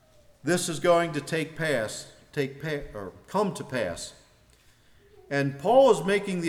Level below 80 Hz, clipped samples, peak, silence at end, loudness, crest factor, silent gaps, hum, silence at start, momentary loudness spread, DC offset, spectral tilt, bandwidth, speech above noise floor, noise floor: -56 dBFS; under 0.1%; -8 dBFS; 0 s; -26 LUFS; 20 dB; none; none; 0.45 s; 16 LU; under 0.1%; -5 dB/octave; 15.5 kHz; 33 dB; -59 dBFS